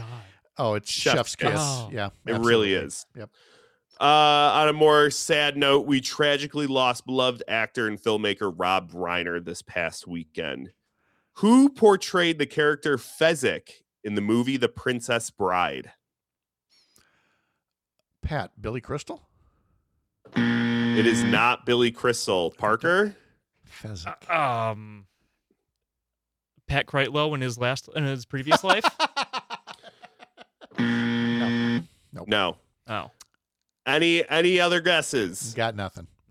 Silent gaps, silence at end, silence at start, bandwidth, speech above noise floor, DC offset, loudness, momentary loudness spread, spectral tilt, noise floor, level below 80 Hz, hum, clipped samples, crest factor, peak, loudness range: none; 0.25 s; 0 s; 16 kHz; 65 dB; under 0.1%; -23 LUFS; 15 LU; -4 dB/octave; -89 dBFS; -56 dBFS; none; under 0.1%; 20 dB; -4 dBFS; 10 LU